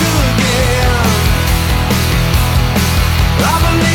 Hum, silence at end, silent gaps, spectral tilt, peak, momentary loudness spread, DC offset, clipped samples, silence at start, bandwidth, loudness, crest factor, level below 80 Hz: none; 0 s; none; -4.5 dB/octave; -2 dBFS; 1 LU; under 0.1%; under 0.1%; 0 s; 19 kHz; -12 LUFS; 10 dB; -18 dBFS